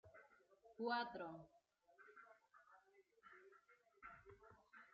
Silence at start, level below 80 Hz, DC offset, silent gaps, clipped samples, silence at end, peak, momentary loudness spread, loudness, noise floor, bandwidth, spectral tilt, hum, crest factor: 0.05 s; -86 dBFS; under 0.1%; none; under 0.1%; 0 s; -30 dBFS; 23 LU; -49 LUFS; -74 dBFS; 7 kHz; -2 dB/octave; none; 24 dB